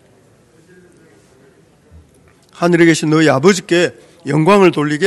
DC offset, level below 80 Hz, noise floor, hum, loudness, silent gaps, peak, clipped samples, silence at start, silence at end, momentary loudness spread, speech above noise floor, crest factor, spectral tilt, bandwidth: under 0.1%; -56 dBFS; -49 dBFS; none; -12 LUFS; none; 0 dBFS; 0.3%; 2.6 s; 0 s; 9 LU; 38 dB; 16 dB; -5.5 dB/octave; 12.5 kHz